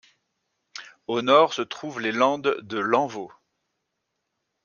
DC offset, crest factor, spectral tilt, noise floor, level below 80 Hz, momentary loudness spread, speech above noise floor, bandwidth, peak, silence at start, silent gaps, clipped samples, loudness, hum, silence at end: under 0.1%; 22 dB; -4.5 dB/octave; -79 dBFS; -74 dBFS; 22 LU; 56 dB; 7.2 kHz; -4 dBFS; 0.75 s; none; under 0.1%; -23 LUFS; none; 1.35 s